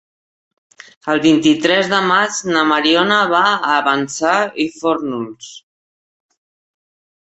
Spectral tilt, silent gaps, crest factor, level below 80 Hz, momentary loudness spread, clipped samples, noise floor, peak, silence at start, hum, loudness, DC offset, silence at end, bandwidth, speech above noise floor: -3.5 dB/octave; none; 16 dB; -60 dBFS; 12 LU; under 0.1%; under -90 dBFS; 0 dBFS; 1.05 s; none; -15 LUFS; under 0.1%; 1.7 s; 8.2 kHz; over 75 dB